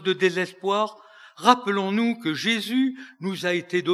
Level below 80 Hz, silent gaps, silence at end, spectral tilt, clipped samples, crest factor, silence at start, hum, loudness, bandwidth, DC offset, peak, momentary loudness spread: under -90 dBFS; none; 0 s; -4.5 dB/octave; under 0.1%; 24 dB; 0 s; none; -24 LUFS; 14 kHz; under 0.1%; 0 dBFS; 8 LU